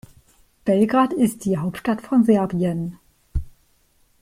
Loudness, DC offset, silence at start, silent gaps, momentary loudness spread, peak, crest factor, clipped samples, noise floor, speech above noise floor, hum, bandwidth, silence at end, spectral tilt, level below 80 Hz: -21 LUFS; under 0.1%; 0.65 s; none; 15 LU; -6 dBFS; 16 dB; under 0.1%; -60 dBFS; 41 dB; none; 16 kHz; 0.7 s; -7.5 dB/octave; -38 dBFS